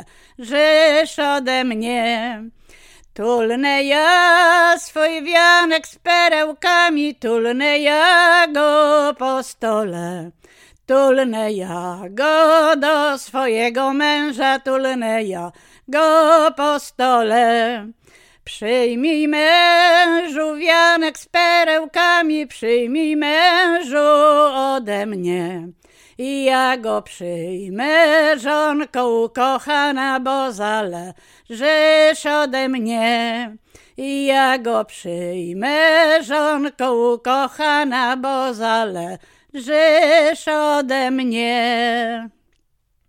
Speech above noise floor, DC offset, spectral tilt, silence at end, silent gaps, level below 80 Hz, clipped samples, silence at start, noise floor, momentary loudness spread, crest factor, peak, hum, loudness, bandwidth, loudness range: 48 dB; under 0.1%; -3 dB/octave; 0.8 s; none; -60 dBFS; under 0.1%; 0 s; -64 dBFS; 13 LU; 16 dB; 0 dBFS; none; -16 LUFS; 16 kHz; 5 LU